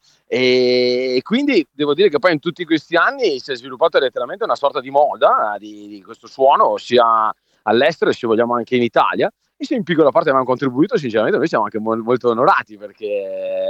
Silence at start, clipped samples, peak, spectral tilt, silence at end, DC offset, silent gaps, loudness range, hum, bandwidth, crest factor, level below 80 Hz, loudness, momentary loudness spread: 0.3 s; under 0.1%; -2 dBFS; -6 dB/octave; 0 s; under 0.1%; none; 2 LU; none; 8.2 kHz; 16 dB; -68 dBFS; -17 LUFS; 10 LU